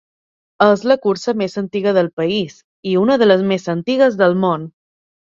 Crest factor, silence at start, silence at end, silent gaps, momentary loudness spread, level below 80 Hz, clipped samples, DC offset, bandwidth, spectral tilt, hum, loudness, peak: 16 dB; 0.6 s; 0.55 s; 2.13-2.17 s, 2.64-2.83 s; 9 LU; -60 dBFS; under 0.1%; under 0.1%; 7.6 kHz; -6.5 dB/octave; none; -16 LUFS; 0 dBFS